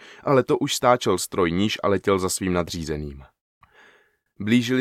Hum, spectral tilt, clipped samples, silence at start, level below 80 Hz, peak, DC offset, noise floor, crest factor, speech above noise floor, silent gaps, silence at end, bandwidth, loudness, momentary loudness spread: none; -4.5 dB/octave; under 0.1%; 0 s; -48 dBFS; -2 dBFS; under 0.1%; -60 dBFS; 20 dB; 38 dB; 3.41-3.61 s; 0 s; 16 kHz; -22 LUFS; 10 LU